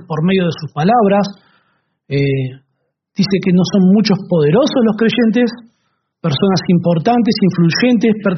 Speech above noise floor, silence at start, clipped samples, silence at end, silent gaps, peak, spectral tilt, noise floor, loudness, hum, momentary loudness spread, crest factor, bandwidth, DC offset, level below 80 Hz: 56 dB; 0.1 s; under 0.1%; 0 s; none; 0 dBFS; -6 dB/octave; -69 dBFS; -14 LUFS; none; 8 LU; 14 dB; 6.4 kHz; under 0.1%; -52 dBFS